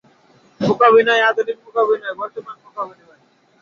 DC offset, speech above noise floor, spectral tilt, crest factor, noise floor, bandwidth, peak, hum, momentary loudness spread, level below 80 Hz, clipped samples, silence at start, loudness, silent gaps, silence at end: under 0.1%; 38 dB; -5.5 dB/octave; 16 dB; -55 dBFS; 7 kHz; -2 dBFS; none; 18 LU; -64 dBFS; under 0.1%; 0.6 s; -16 LUFS; none; 0.75 s